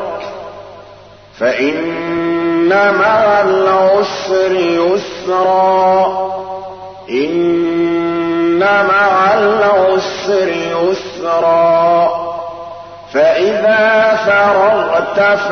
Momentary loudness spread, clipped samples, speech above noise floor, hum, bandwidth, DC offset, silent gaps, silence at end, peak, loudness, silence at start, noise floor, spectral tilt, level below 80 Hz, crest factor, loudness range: 13 LU; under 0.1%; 27 dB; none; 6.6 kHz; 0.2%; none; 0 s; -2 dBFS; -12 LUFS; 0 s; -38 dBFS; -5.5 dB/octave; -52 dBFS; 10 dB; 2 LU